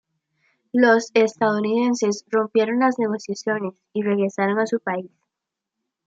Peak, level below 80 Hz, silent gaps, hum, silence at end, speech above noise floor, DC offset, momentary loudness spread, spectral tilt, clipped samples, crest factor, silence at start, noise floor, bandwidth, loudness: -4 dBFS; -76 dBFS; none; none; 1 s; 64 dB; under 0.1%; 10 LU; -5 dB/octave; under 0.1%; 18 dB; 0.75 s; -84 dBFS; 8 kHz; -21 LUFS